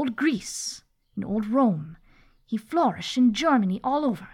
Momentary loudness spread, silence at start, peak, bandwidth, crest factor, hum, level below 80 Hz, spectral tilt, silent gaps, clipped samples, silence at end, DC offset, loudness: 13 LU; 0 s; -10 dBFS; 14.5 kHz; 14 dB; none; -58 dBFS; -5 dB/octave; none; under 0.1%; 0.05 s; under 0.1%; -25 LUFS